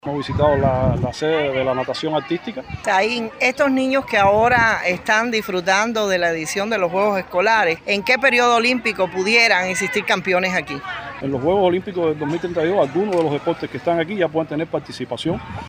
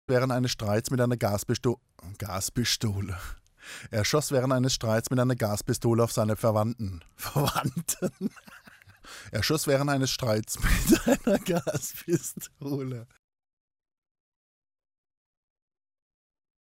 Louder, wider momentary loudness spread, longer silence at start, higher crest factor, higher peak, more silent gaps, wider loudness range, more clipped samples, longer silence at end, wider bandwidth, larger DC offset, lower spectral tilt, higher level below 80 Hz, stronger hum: first, -18 LUFS vs -28 LUFS; second, 10 LU vs 13 LU; about the same, 0.05 s vs 0.1 s; about the same, 16 dB vs 20 dB; first, -2 dBFS vs -8 dBFS; neither; second, 4 LU vs 8 LU; neither; second, 0 s vs 3.65 s; about the same, 15.5 kHz vs 16 kHz; neither; about the same, -4.5 dB/octave vs -5 dB/octave; about the same, -44 dBFS vs -42 dBFS; neither